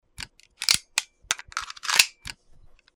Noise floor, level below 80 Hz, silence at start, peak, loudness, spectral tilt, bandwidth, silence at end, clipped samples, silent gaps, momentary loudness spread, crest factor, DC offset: -52 dBFS; -56 dBFS; 0.2 s; -2 dBFS; -24 LUFS; 2 dB/octave; over 20 kHz; 0.65 s; under 0.1%; none; 21 LU; 28 dB; under 0.1%